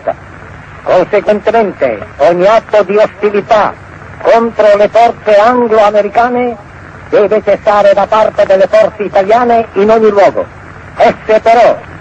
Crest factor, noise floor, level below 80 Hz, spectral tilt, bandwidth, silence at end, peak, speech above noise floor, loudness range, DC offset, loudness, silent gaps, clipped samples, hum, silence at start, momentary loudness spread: 8 dB; -29 dBFS; -42 dBFS; -6 dB/octave; 8.2 kHz; 0 s; 0 dBFS; 22 dB; 2 LU; under 0.1%; -9 LUFS; none; under 0.1%; none; 0.05 s; 8 LU